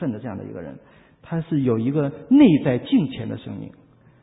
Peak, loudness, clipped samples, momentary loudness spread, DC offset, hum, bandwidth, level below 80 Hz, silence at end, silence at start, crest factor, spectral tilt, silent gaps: -4 dBFS; -20 LUFS; under 0.1%; 21 LU; under 0.1%; none; 4 kHz; -54 dBFS; 0.55 s; 0 s; 18 dB; -12.5 dB/octave; none